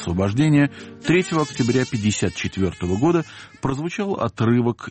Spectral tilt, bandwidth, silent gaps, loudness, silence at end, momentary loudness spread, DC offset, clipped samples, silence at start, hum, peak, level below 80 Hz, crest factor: -6 dB/octave; 8.8 kHz; none; -21 LUFS; 0 s; 7 LU; under 0.1%; under 0.1%; 0 s; none; -8 dBFS; -48 dBFS; 14 dB